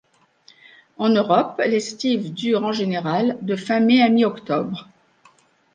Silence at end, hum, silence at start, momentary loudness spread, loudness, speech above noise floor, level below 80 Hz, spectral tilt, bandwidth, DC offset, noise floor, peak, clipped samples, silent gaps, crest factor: 0.9 s; none; 1 s; 9 LU; -20 LUFS; 37 dB; -68 dBFS; -5.5 dB/octave; 9 kHz; under 0.1%; -56 dBFS; -4 dBFS; under 0.1%; none; 18 dB